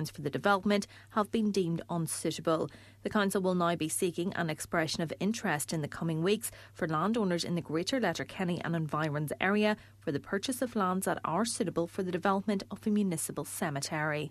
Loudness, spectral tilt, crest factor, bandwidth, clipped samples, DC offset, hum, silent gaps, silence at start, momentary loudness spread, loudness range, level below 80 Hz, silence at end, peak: -32 LUFS; -5 dB/octave; 20 dB; 14 kHz; under 0.1%; under 0.1%; none; none; 0 s; 6 LU; 1 LU; -66 dBFS; 0 s; -12 dBFS